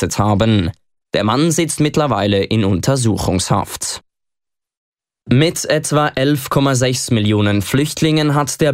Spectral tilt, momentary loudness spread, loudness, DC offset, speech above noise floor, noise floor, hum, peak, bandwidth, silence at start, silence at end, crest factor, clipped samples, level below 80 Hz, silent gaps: -5 dB/octave; 4 LU; -16 LUFS; under 0.1%; 71 dB; -86 dBFS; none; -2 dBFS; 16 kHz; 0 s; 0 s; 14 dB; under 0.1%; -42 dBFS; 4.77-4.92 s